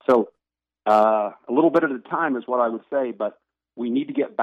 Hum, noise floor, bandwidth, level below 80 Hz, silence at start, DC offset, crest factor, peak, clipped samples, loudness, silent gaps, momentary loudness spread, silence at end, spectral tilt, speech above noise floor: none; -83 dBFS; 8.2 kHz; -72 dBFS; 0.1 s; under 0.1%; 16 dB; -6 dBFS; under 0.1%; -22 LUFS; none; 12 LU; 0 s; -7.5 dB/octave; 62 dB